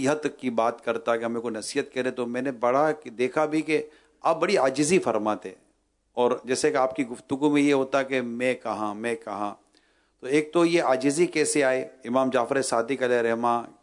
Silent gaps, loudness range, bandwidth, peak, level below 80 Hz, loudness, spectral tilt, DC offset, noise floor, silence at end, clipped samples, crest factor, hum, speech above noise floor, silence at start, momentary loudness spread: none; 3 LU; 11 kHz; -10 dBFS; -72 dBFS; -25 LUFS; -4.5 dB/octave; under 0.1%; -69 dBFS; 0.15 s; under 0.1%; 16 dB; none; 44 dB; 0 s; 8 LU